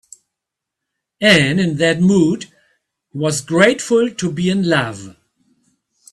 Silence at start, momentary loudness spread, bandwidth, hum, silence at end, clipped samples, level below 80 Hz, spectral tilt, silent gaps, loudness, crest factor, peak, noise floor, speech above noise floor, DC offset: 1.2 s; 14 LU; 13 kHz; none; 1 s; under 0.1%; -54 dBFS; -5 dB/octave; none; -15 LUFS; 18 dB; 0 dBFS; -82 dBFS; 67 dB; under 0.1%